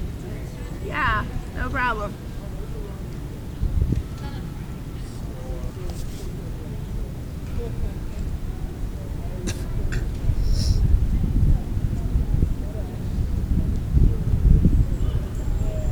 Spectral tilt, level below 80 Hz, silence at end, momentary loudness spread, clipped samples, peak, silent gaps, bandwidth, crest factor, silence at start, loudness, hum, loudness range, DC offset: -7 dB/octave; -24 dBFS; 0 s; 12 LU; under 0.1%; -2 dBFS; none; 19.5 kHz; 22 dB; 0 s; -26 LUFS; none; 9 LU; under 0.1%